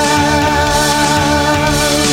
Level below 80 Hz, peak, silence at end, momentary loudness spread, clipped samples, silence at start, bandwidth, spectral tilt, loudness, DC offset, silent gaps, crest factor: -26 dBFS; 0 dBFS; 0 s; 1 LU; under 0.1%; 0 s; 16.5 kHz; -3.5 dB/octave; -12 LUFS; under 0.1%; none; 12 dB